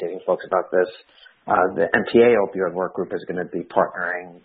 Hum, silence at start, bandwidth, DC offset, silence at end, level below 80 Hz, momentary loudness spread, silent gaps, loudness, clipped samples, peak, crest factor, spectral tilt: none; 0 s; 4.7 kHz; under 0.1%; 0.1 s; -64 dBFS; 12 LU; none; -21 LUFS; under 0.1%; -2 dBFS; 20 dB; -10.5 dB/octave